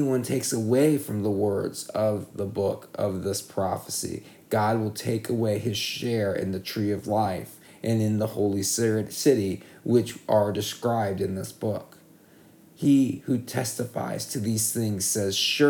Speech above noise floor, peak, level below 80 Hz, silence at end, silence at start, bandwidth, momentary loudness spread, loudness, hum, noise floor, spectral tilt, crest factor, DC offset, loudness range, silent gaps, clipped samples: 28 dB; -8 dBFS; -64 dBFS; 0 s; 0 s; 19.5 kHz; 8 LU; -26 LUFS; none; -54 dBFS; -5 dB/octave; 18 dB; under 0.1%; 3 LU; none; under 0.1%